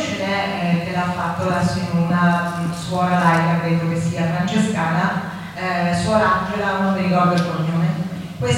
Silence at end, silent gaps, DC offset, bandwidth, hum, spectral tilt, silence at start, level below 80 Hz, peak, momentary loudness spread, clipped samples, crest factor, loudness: 0 s; none; under 0.1%; 12 kHz; none; -6.5 dB/octave; 0 s; -48 dBFS; -2 dBFS; 7 LU; under 0.1%; 16 dB; -19 LUFS